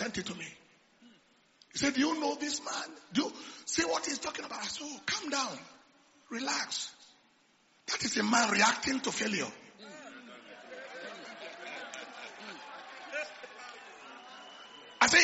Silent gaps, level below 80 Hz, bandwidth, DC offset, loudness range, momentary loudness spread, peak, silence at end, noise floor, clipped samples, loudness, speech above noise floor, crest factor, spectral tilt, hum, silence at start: none; -70 dBFS; 8 kHz; under 0.1%; 13 LU; 21 LU; -8 dBFS; 0 s; -67 dBFS; under 0.1%; -33 LUFS; 34 dB; 26 dB; -1 dB/octave; none; 0 s